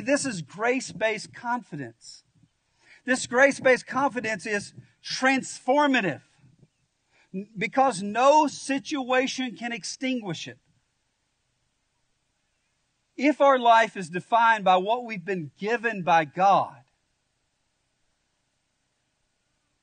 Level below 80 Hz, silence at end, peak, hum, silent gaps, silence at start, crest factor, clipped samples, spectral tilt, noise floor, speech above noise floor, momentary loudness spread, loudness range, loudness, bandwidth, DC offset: -74 dBFS; 3.1 s; -6 dBFS; none; none; 0 s; 20 dB; under 0.1%; -4 dB/octave; -74 dBFS; 50 dB; 15 LU; 8 LU; -24 LUFS; 9.6 kHz; under 0.1%